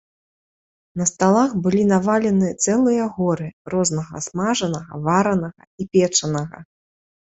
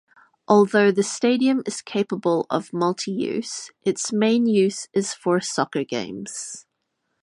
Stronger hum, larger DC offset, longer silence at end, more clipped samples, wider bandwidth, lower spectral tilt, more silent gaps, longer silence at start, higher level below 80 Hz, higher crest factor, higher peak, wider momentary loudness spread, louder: neither; neither; about the same, 0.75 s vs 0.65 s; neither; second, 8.2 kHz vs 11.5 kHz; about the same, -5 dB/octave vs -4.5 dB/octave; first, 3.53-3.65 s, 5.67-5.78 s vs none; first, 0.95 s vs 0.5 s; first, -56 dBFS vs -70 dBFS; about the same, 18 dB vs 20 dB; about the same, -4 dBFS vs -2 dBFS; about the same, 10 LU vs 12 LU; about the same, -20 LUFS vs -22 LUFS